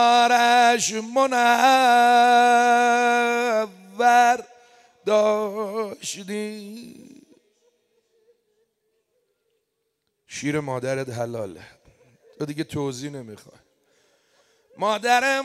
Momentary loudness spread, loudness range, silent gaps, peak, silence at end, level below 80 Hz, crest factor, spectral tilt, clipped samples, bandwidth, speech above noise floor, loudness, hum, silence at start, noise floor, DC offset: 18 LU; 18 LU; none; -4 dBFS; 0 s; -70 dBFS; 18 dB; -3 dB/octave; under 0.1%; 14.5 kHz; 56 dB; -20 LUFS; none; 0 s; -76 dBFS; under 0.1%